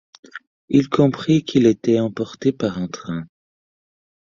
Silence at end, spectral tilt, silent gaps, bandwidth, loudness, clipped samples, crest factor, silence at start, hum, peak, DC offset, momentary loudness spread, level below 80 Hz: 1.1 s; -7 dB/octave; 0.47-0.68 s; 7.4 kHz; -19 LUFS; under 0.1%; 18 dB; 0.35 s; none; -2 dBFS; under 0.1%; 22 LU; -56 dBFS